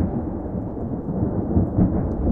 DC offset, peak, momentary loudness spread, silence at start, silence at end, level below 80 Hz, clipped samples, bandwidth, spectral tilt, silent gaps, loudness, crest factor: under 0.1%; -6 dBFS; 8 LU; 0 s; 0 s; -32 dBFS; under 0.1%; 2.3 kHz; -13.5 dB/octave; none; -24 LUFS; 16 dB